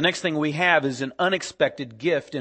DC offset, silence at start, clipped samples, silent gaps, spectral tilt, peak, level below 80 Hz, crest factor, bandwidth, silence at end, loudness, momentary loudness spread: under 0.1%; 0 s; under 0.1%; none; -4.5 dB/octave; -4 dBFS; -66 dBFS; 20 dB; 8.8 kHz; 0 s; -23 LUFS; 6 LU